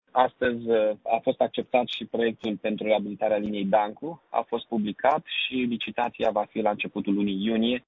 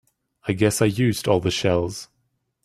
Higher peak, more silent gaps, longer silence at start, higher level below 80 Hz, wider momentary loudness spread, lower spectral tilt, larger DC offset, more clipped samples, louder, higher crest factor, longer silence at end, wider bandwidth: about the same, -6 dBFS vs -4 dBFS; neither; second, 0.15 s vs 0.45 s; second, -62 dBFS vs -52 dBFS; second, 5 LU vs 11 LU; first, -7.5 dB/octave vs -5 dB/octave; neither; neither; second, -26 LUFS vs -21 LUFS; about the same, 20 dB vs 20 dB; second, 0.1 s vs 0.6 s; second, 7 kHz vs 15.5 kHz